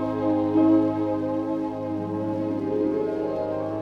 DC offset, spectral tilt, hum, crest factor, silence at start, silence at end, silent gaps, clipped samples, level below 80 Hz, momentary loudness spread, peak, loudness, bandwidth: under 0.1%; -9.5 dB/octave; none; 14 dB; 0 s; 0 s; none; under 0.1%; -56 dBFS; 9 LU; -10 dBFS; -25 LUFS; 5.6 kHz